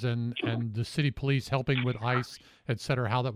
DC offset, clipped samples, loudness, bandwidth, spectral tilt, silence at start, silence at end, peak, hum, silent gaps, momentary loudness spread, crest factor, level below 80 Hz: under 0.1%; under 0.1%; -30 LUFS; 13.5 kHz; -6.5 dB/octave; 0 s; 0 s; -14 dBFS; none; none; 7 LU; 16 dB; -56 dBFS